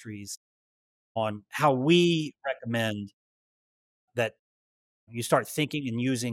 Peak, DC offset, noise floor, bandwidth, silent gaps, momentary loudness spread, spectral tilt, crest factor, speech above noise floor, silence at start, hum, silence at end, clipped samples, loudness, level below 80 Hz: -10 dBFS; under 0.1%; under -90 dBFS; 16.5 kHz; 0.37-1.15 s, 3.13-4.08 s, 4.39-5.07 s; 17 LU; -5 dB/octave; 18 dB; over 63 dB; 0 s; none; 0 s; under 0.1%; -28 LUFS; -74 dBFS